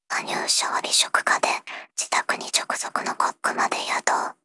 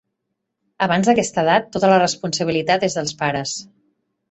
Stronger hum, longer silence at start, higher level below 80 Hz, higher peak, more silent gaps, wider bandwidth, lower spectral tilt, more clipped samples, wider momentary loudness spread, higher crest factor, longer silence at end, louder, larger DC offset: neither; second, 0.1 s vs 0.8 s; second, -88 dBFS vs -56 dBFS; about the same, -4 dBFS vs -2 dBFS; neither; first, 12 kHz vs 8.4 kHz; second, 0.5 dB/octave vs -4 dB/octave; neither; about the same, 7 LU vs 8 LU; about the same, 20 dB vs 18 dB; second, 0.1 s vs 0.7 s; second, -23 LUFS vs -18 LUFS; neither